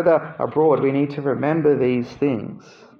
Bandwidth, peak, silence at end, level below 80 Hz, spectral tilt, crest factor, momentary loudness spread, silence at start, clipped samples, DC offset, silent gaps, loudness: 6.6 kHz; -4 dBFS; 0.4 s; -60 dBFS; -9 dB/octave; 16 dB; 6 LU; 0 s; under 0.1%; under 0.1%; none; -20 LUFS